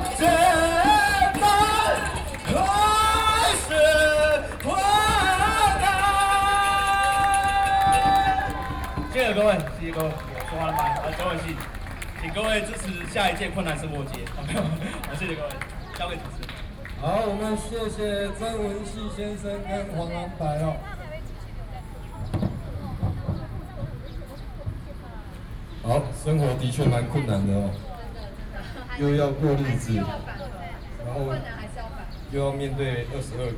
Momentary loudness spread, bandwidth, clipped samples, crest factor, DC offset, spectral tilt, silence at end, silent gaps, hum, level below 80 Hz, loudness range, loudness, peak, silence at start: 18 LU; over 20 kHz; under 0.1%; 18 dB; under 0.1%; -4.5 dB/octave; 0 s; none; none; -36 dBFS; 12 LU; -24 LUFS; -6 dBFS; 0 s